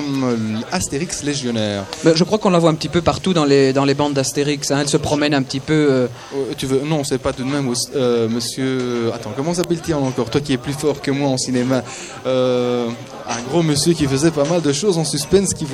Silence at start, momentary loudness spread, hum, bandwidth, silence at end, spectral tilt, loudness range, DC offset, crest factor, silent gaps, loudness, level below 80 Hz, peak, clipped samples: 0 s; 7 LU; none; 14.5 kHz; 0 s; -5 dB/octave; 4 LU; under 0.1%; 18 dB; none; -18 LUFS; -46 dBFS; 0 dBFS; under 0.1%